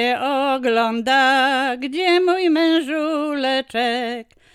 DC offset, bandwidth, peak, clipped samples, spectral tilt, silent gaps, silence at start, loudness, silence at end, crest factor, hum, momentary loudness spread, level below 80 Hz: under 0.1%; 14.5 kHz; -6 dBFS; under 0.1%; -3 dB/octave; none; 0 s; -18 LUFS; 0.3 s; 14 dB; none; 7 LU; -62 dBFS